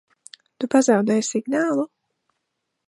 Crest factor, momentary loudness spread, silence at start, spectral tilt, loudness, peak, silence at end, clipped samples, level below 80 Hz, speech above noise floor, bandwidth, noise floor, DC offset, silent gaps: 20 dB; 11 LU; 0.6 s; -4.5 dB/octave; -21 LUFS; -4 dBFS; 1 s; under 0.1%; -74 dBFS; 58 dB; 11.5 kHz; -78 dBFS; under 0.1%; none